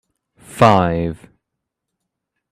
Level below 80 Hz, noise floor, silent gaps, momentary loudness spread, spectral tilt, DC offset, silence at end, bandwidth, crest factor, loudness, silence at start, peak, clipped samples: -46 dBFS; -79 dBFS; none; 24 LU; -6.5 dB/octave; under 0.1%; 1.35 s; 14.5 kHz; 20 dB; -15 LUFS; 0.5 s; 0 dBFS; under 0.1%